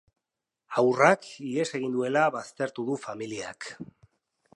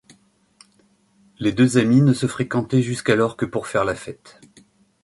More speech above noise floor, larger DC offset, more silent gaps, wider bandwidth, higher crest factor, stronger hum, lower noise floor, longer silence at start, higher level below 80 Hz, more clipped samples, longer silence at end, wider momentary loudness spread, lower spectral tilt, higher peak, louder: first, 60 dB vs 41 dB; neither; neither; about the same, 11.5 kHz vs 11.5 kHz; first, 24 dB vs 18 dB; neither; first, -87 dBFS vs -60 dBFS; second, 0.7 s vs 1.4 s; second, -76 dBFS vs -54 dBFS; neither; second, 0.7 s vs 0.9 s; first, 18 LU vs 11 LU; second, -5 dB/octave vs -6.5 dB/octave; about the same, -4 dBFS vs -2 dBFS; second, -27 LUFS vs -20 LUFS